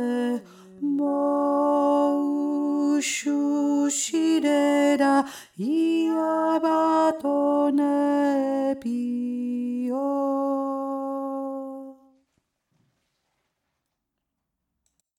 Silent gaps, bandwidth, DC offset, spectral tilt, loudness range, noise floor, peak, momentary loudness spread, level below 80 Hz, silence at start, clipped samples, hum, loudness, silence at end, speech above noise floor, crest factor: none; 15.5 kHz; under 0.1%; -3.5 dB/octave; 10 LU; -81 dBFS; -10 dBFS; 9 LU; -78 dBFS; 0 s; under 0.1%; none; -24 LUFS; 3.25 s; 57 dB; 16 dB